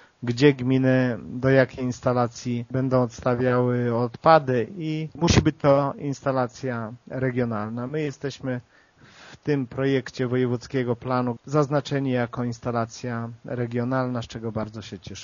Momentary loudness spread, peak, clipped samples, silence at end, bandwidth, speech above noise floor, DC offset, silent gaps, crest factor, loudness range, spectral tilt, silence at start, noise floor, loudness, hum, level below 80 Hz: 11 LU; -2 dBFS; under 0.1%; 0 s; 7.2 kHz; 27 dB; under 0.1%; none; 22 dB; 7 LU; -6 dB/octave; 0.2 s; -51 dBFS; -24 LUFS; none; -48 dBFS